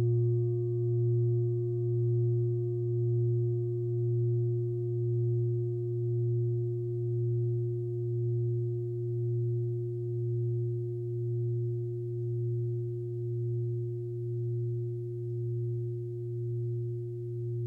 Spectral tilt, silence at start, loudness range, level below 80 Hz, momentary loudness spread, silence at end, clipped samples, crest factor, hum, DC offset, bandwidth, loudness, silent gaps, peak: -13.5 dB/octave; 0 s; 5 LU; -66 dBFS; 6 LU; 0 s; under 0.1%; 10 dB; none; under 0.1%; 0.7 kHz; -32 LUFS; none; -20 dBFS